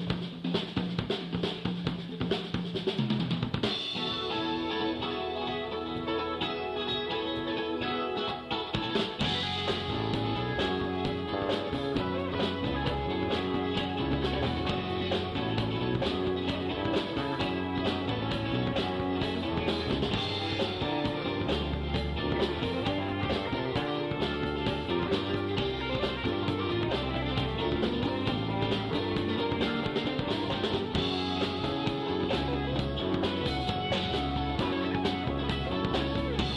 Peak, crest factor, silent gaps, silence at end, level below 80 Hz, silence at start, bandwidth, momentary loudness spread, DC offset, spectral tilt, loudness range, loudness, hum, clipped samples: -14 dBFS; 16 dB; none; 0 s; -44 dBFS; 0 s; 12 kHz; 3 LU; under 0.1%; -6.5 dB/octave; 2 LU; -31 LUFS; none; under 0.1%